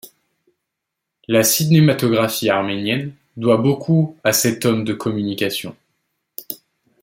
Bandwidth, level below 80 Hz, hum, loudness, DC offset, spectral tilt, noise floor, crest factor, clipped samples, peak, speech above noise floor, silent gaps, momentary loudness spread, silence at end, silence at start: 16.5 kHz; -60 dBFS; none; -17 LUFS; under 0.1%; -5 dB/octave; -80 dBFS; 16 dB; under 0.1%; -2 dBFS; 63 dB; none; 18 LU; 0.5 s; 0.05 s